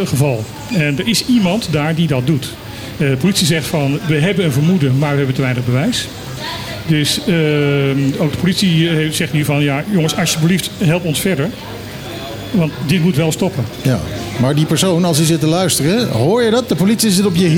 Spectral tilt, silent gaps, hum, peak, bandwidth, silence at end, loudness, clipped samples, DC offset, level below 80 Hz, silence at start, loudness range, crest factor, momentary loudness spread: -5 dB/octave; none; none; -2 dBFS; 17 kHz; 0 s; -15 LUFS; under 0.1%; under 0.1%; -42 dBFS; 0 s; 3 LU; 12 dB; 9 LU